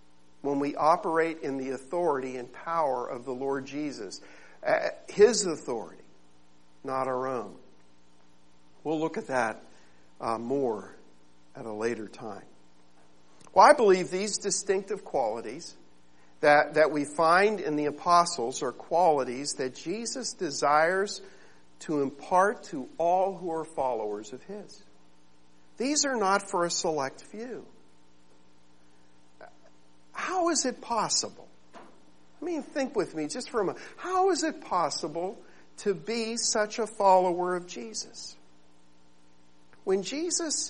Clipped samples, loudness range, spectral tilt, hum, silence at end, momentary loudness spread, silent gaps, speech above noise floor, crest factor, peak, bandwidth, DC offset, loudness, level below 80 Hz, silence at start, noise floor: under 0.1%; 9 LU; -3 dB/octave; 60 Hz at -70 dBFS; 0 s; 17 LU; none; 35 dB; 24 dB; -6 dBFS; 11 kHz; 0.3%; -28 LUFS; -68 dBFS; 0.45 s; -63 dBFS